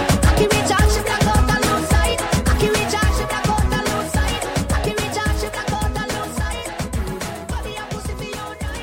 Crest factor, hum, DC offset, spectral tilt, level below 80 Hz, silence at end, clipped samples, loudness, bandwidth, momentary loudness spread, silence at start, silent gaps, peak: 14 dB; none; under 0.1%; -4.5 dB/octave; -24 dBFS; 0 s; under 0.1%; -20 LUFS; 16.5 kHz; 11 LU; 0 s; none; -4 dBFS